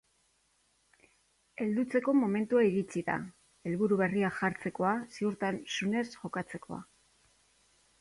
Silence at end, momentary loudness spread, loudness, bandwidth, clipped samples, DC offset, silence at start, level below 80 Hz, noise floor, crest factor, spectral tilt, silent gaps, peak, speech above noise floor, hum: 1.2 s; 15 LU; -32 LUFS; 11.5 kHz; under 0.1%; under 0.1%; 1.6 s; -70 dBFS; -72 dBFS; 18 dB; -6 dB/octave; none; -16 dBFS; 41 dB; none